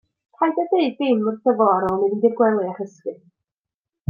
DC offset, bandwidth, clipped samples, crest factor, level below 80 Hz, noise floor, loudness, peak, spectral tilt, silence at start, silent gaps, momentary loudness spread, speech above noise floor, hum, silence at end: under 0.1%; 7 kHz; under 0.1%; 18 dB; -62 dBFS; -89 dBFS; -20 LUFS; -4 dBFS; -8 dB/octave; 0.4 s; none; 13 LU; 69 dB; none; 0.95 s